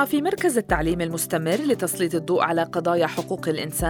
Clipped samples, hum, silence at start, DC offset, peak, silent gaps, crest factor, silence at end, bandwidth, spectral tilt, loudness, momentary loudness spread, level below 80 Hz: under 0.1%; none; 0 s; under 0.1%; -6 dBFS; none; 18 dB; 0 s; over 20 kHz; -4.5 dB/octave; -23 LUFS; 4 LU; -42 dBFS